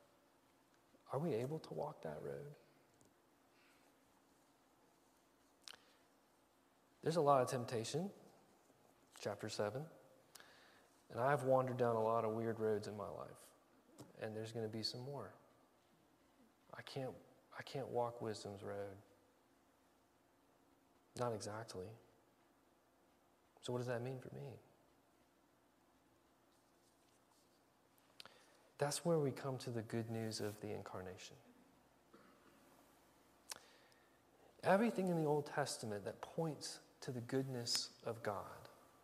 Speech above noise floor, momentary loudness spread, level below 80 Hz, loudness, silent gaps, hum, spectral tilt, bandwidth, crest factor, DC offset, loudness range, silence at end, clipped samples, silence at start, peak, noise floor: 33 dB; 21 LU; -84 dBFS; -43 LUFS; none; none; -5 dB/octave; 15.5 kHz; 28 dB; under 0.1%; 12 LU; 0.3 s; under 0.1%; 1.05 s; -18 dBFS; -75 dBFS